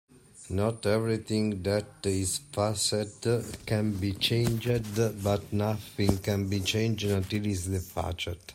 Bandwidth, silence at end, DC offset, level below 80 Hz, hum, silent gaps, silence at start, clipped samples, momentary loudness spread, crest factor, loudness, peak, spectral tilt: 16 kHz; 0 s; under 0.1%; -52 dBFS; none; none; 0.35 s; under 0.1%; 5 LU; 20 dB; -29 LUFS; -10 dBFS; -5 dB/octave